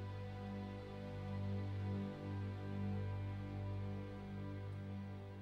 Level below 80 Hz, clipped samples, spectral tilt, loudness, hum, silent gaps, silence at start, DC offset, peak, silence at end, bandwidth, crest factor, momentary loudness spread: -62 dBFS; under 0.1%; -8.5 dB/octave; -46 LUFS; 50 Hz at -55 dBFS; none; 0 s; under 0.1%; -34 dBFS; 0 s; 6.2 kHz; 10 dB; 6 LU